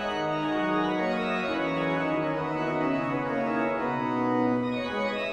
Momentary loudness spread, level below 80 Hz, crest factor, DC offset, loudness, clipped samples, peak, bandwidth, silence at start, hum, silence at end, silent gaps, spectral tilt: 3 LU; -58 dBFS; 14 dB; under 0.1%; -28 LUFS; under 0.1%; -14 dBFS; 9.8 kHz; 0 s; none; 0 s; none; -6.5 dB/octave